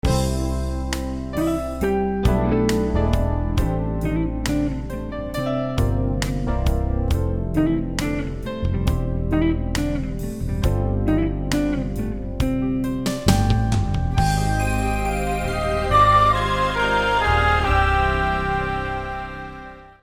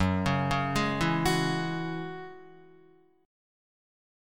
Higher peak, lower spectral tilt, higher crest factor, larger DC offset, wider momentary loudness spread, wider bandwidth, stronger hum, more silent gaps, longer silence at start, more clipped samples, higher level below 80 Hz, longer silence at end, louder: first, -4 dBFS vs -14 dBFS; about the same, -6 dB/octave vs -5.5 dB/octave; about the same, 18 dB vs 18 dB; second, under 0.1% vs 0.3%; second, 9 LU vs 13 LU; about the same, 18 kHz vs 17.5 kHz; neither; neither; about the same, 0.05 s vs 0 s; neither; first, -26 dBFS vs -48 dBFS; second, 0.1 s vs 1 s; first, -22 LUFS vs -29 LUFS